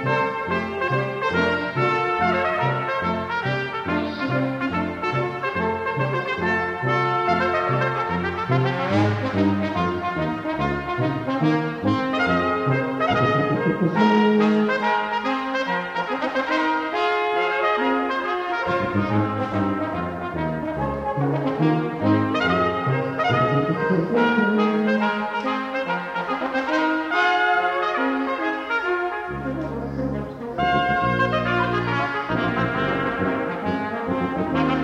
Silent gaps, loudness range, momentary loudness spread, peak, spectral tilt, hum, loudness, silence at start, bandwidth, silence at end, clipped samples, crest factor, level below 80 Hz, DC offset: none; 3 LU; 6 LU; -6 dBFS; -7 dB/octave; none; -22 LUFS; 0 s; 9.6 kHz; 0 s; under 0.1%; 16 dB; -48 dBFS; under 0.1%